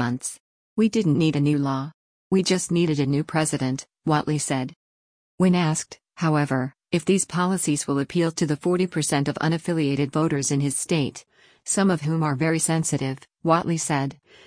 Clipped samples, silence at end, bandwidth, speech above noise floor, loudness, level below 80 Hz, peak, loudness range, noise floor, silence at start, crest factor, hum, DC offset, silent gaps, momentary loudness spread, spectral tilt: under 0.1%; 0.3 s; 10.5 kHz; over 67 dB; -23 LUFS; -60 dBFS; -6 dBFS; 1 LU; under -90 dBFS; 0 s; 16 dB; none; under 0.1%; 0.40-0.76 s, 1.94-2.31 s, 4.76-5.38 s; 8 LU; -5 dB/octave